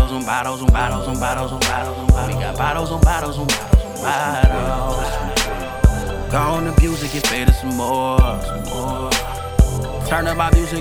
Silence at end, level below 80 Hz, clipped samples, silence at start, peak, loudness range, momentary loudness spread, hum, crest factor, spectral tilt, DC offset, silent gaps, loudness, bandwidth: 0 s; -20 dBFS; under 0.1%; 0 s; 0 dBFS; 1 LU; 5 LU; none; 16 dB; -5 dB/octave; under 0.1%; none; -19 LUFS; 17.5 kHz